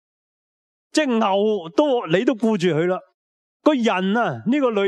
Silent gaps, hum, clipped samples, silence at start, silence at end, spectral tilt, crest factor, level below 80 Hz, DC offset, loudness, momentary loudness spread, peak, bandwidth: 3.14-3.60 s; none; under 0.1%; 0.95 s; 0 s; -6 dB/octave; 18 dB; -74 dBFS; under 0.1%; -20 LUFS; 3 LU; -2 dBFS; 11 kHz